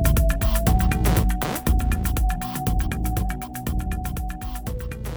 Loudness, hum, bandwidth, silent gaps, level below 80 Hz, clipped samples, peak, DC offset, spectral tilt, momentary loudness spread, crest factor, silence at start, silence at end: -24 LUFS; none; over 20 kHz; none; -24 dBFS; under 0.1%; -6 dBFS; under 0.1%; -5.5 dB/octave; 11 LU; 16 dB; 0 s; 0 s